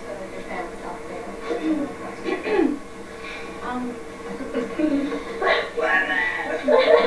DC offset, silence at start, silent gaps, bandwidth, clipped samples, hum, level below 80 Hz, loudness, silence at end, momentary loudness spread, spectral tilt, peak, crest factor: 0.6%; 0 s; none; 11 kHz; under 0.1%; none; -48 dBFS; -24 LUFS; 0 s; 14 LU; -4.5 dB/octave; -2 dBFS; 22 dB